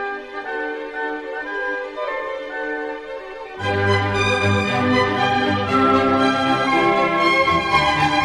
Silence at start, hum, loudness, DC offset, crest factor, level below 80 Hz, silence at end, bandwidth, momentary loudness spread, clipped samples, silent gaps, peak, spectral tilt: 0 s; none; -19 LUFS; under 0.1%; 16 dB; -46 dBFS; 0 s; 12 kHz; 11 LU; under 0.1%; none; -4 dBFS; -5.5 dB/octave